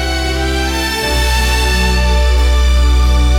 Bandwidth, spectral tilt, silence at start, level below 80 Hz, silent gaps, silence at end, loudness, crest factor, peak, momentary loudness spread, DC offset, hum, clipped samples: 16 kHz; -4.5 dB/octave; 0 s; -12 dBFS; none; 0 s; -13 LUFS; 10 dB; -2 dBFS; 4 LU; under 0.1%; none; under 0.1%